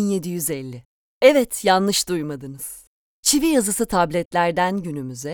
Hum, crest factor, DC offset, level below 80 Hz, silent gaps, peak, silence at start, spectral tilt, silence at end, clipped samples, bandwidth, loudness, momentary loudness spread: none; 20 dB; under 0.1%; -50 dBFS; 0.85-1.21 s, 2.87-3.23 s, 4.25-4.31 s; 0 dBFS; 0 s; -3.5 dB/octave; 0 s; under 0.1%; over 20 kHz; -20 LUFS; 16 LU